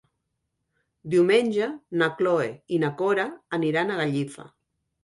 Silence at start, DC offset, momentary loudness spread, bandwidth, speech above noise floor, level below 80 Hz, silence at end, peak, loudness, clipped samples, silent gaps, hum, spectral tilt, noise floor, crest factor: 1.05 s; under 0.1%; 9 LU; 11.5 kHz; 55 dB; -68 dBFS; 0.55 s; -8 dBFS; -24 LUFS; under 0.1%; none; none; -6.5 dB/octave; -79 dBFS; 18 dB